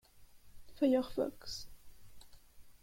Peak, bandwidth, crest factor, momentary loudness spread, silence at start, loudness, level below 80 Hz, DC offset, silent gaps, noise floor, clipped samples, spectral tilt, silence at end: -20 dBFS; 16.5 kHz; 18 dB; 15 LU; 0.15 s; -36 LUFS; -60 dBFS; under 0.1%; none; -58 dBFS; under 0.1%; -5 dB/octave; 0.1 s